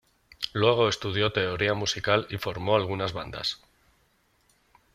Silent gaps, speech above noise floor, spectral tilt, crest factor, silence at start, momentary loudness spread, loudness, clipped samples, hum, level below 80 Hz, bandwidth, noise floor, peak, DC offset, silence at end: none; 41 dB; -4.5 dB/octave; 22 dB; 0.4 s; 9 LU; -26 LUFS; under 0.1%; none; -56 dBFS; 15.5 kHz; -67 dBFS; -6 dBFS; under 0.1%; 1.4 s